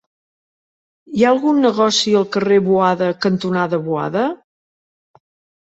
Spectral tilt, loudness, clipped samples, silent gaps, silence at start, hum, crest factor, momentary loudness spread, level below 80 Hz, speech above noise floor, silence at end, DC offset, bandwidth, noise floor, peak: -5 dB/octave; -16 LUFS; under 0.1%; none; 1.1 s; none; 16 dB; 7 LU; -60 dBFS; over 75 dB; 1.3 s; under 0.1%; 8.2 kHz; under -90 dBFS; -2 dBFS